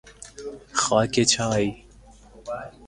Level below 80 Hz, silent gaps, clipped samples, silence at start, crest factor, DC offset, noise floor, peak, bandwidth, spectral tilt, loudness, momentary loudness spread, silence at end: -50 dBFS; none; under 0.1%; 0.05 s; 22 dB; under 0.1%; -50 dBFS; -4 dBFS; 11.5 kHz; -3.5 dB/octave; -22 LUFS; 19 LU; 0 s